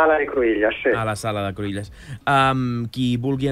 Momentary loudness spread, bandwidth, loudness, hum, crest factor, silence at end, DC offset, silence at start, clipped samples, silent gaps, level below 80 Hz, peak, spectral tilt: 11 LU; 15 kHz; -21 LUFS; none; 16 dB; 0 s; under 0.1%; 0 s; under 0.1%; none; -46 dBFS; -4 dBFS; -6 dB/octave